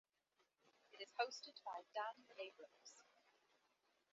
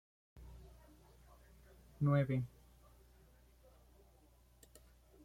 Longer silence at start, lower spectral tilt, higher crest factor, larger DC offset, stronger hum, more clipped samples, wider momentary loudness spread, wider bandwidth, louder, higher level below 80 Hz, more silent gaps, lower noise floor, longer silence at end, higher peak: first, 0.9 s vs 0.35 s; second, 3 dB/octave vs -9 dB/octave; first, 26 dB vs 20 dB; neither; neither; neither; second, 18 LU vs 30 LU; second, 7.6 kHz vs 14.5 kHz; second, -50 LUFS vs -37 LUFS; second, under -90 dBFS vs -64 dBFS; neither; first, -85 dBFS vs -67 dBFS; second, 1.1 s vs 2.8 s; second, -28 dBFS vs -24 dBFS